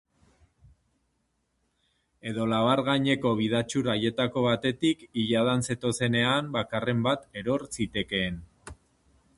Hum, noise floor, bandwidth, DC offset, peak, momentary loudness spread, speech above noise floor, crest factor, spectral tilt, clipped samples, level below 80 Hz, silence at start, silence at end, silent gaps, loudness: none; -75 dBFS; 11.5 kHz; under 0.1%; -8 dBFS; 7 LU; 48 dB; 20 dB; -5 dB/octave; under 0.1%; -56 dBFS; 2.25 s; 0.65 s; none; -27 LUFS